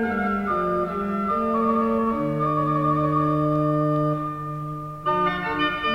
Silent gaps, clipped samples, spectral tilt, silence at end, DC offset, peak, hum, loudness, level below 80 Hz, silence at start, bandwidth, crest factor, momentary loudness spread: none; under 0.1%; -8 dB/octave; 0 s; under 0.1%; -10 dBFS; none; -23 LUFS; -48 dBFS; 0 s; 6.2 kHz; 14 dB; 7 LU